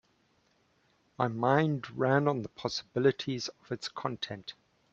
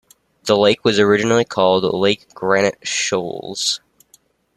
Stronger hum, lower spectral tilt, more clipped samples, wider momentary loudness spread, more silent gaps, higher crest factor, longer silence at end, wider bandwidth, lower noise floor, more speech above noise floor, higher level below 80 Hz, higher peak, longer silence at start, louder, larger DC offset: neither; first, -6 dB/octave vs -3.5 dB/octave; neither; first, 11 LU vs 8 LU; neither; first, 22 dB vs 16 dB; second, 0.4 s vs 0.8 s; second, 8 kHz vs 13 kHz; first, -70 dBFS vs -56 dBFS; about the same, 40 dB vs 39 dB; second, -70 dBFS vs -58 dBFS; second, -10 dBFS vs -2 dBFS; first, 1.2 s vs 0.45 s; second, -31 LUFS vs -17 LUFS; neither